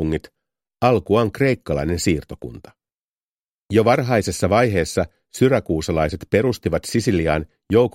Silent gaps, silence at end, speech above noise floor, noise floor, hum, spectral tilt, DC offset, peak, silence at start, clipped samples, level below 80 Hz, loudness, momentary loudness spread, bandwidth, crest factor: 2.94-3.66 s; 0.05 s; over 71 dB; under -90 dBFS; none; -6 dB/octave; under 0.1%; 0 dBFS; 0 s; under 0.1%; -40 dBFS; -20 LUFS; 8 LU; 16 kHz; 20 dB